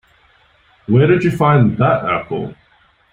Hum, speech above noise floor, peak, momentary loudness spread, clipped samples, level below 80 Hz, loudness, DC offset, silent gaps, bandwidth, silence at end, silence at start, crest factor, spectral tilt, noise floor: none; 41 dB; -2 dBFS; 13 LU; under 0.1%; -48 dBFS; -15 LUFS; under 0.1%; none; 9.8 kHz; 0.6 s; 0.9 s; 14 dB; -9 dB/octave; -54 dBFS